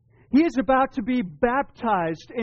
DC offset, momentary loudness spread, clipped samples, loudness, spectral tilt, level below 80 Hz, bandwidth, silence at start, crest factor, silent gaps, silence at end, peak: under 0.1%; 5 LU; under 0.1%; -23 LUFS; -5 dB/octave; -50 dBFS; 6.8 kHz; 0.3 s; 12 dB; none; 0 s; -10 dBFS